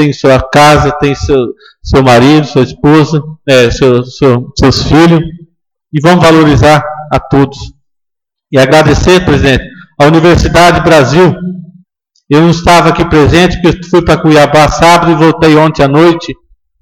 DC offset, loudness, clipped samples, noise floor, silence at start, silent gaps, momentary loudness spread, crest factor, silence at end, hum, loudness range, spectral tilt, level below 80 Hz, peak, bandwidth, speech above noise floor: under 0.1%; -6 LUFS; 1%; -75 dBFS; 0 s; none; 8 LU; 6 dB; 0.5 s; none; 3 LU; -6 dB/octave; -24 dBFS; 0 dBFS; 17 kHz; 70 dB